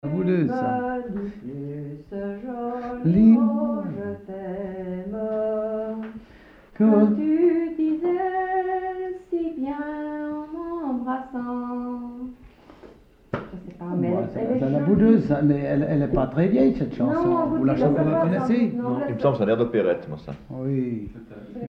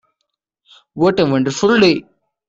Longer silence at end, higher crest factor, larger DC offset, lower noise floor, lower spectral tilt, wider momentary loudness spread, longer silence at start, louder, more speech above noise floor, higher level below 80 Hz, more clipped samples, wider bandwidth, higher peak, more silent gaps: second, 0 s vs 0.45 s; about the same, 18 dB vs 16 dB; neither; second, -49 dBFS vs -75 dBFS; first, -10.5 dB/octave vs -5.5 dB/octave; first, 15 LU vs 9 LU; second, 0.05 s vs 0.95 s; second, -23 LUFS vs -15 LUFS; second, 27 dB vs 61 dB; first, -48 dBFS vs -54 dBFS; neither; second, 5.6 kHz vs 7.8 kHz; second, -6 dBFS vs -2 dBFS; neither